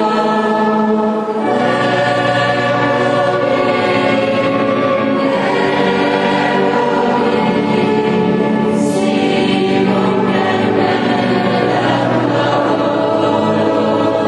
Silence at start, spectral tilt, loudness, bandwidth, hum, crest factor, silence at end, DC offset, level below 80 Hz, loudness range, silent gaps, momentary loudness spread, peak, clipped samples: 0 s; -6.5 dB/octave; -14 LUFS; 11.5 kHz; none; 12 dB; 0 s; under 0.1%; -50 dBFS; 0 LU; none; 1 LU; 0 dBFS; under 0.1%